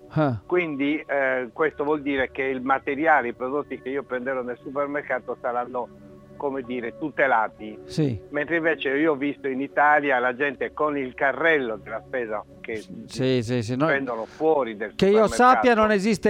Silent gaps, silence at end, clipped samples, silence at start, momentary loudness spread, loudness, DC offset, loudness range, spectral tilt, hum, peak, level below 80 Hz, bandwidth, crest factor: none; 0 s; under 0.1%; 0 s; 12 LU; -24 LUFS; under 0.1%; 5 LU; -6 dB/octave; none; -6 dBFS; -56 dBFS; 15 kHz; 18 dB